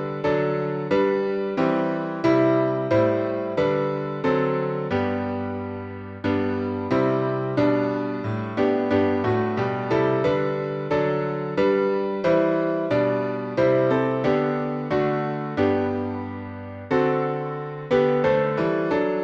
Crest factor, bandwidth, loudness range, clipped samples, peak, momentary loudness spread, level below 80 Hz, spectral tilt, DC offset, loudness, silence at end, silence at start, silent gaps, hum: 16 dB; 7.2 kHz; 3 LU; under 0.1%; -8 dBFS; 7 LU; -56 dBFS; -8.5 dB/octave; under 0.1%; -23 LUFS; 0 s; 0 s; none; none